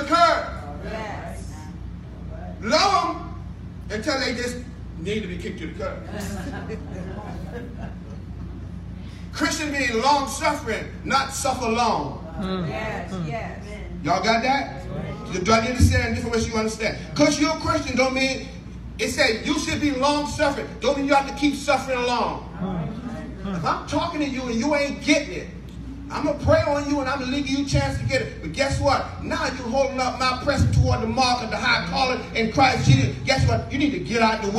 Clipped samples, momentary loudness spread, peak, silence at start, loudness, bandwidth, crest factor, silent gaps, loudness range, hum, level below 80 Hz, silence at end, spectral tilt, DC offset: under 0.1%; 16 LU; -4 dBFS; 0 s; -23 LUFS; 14 kHz; 20 dB; none; 8 LU; none; -38 dBFS; 0 s; -5 dB/octave; under 0.1%